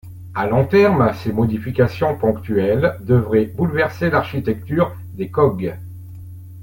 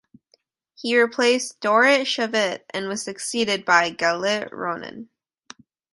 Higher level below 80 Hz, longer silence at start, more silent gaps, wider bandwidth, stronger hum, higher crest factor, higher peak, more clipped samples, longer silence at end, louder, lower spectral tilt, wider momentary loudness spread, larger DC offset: first, -46 dBFS vs -70 dBFS; second, 0.05 s vs 0.8 s; neither; first, 17 kHz vs 11.5 kHz; neither; second, 16 dB vs 22 dB; about the same, -2 dBFS vs -2 dBFS; neither; second, 0 s vs 0.9 s; first, -18 LUFS vs -21 LUFS; first, -8.5 dB/octave vs -2.5 dB/octave; about the same, 14 LU vs 12 LU; neither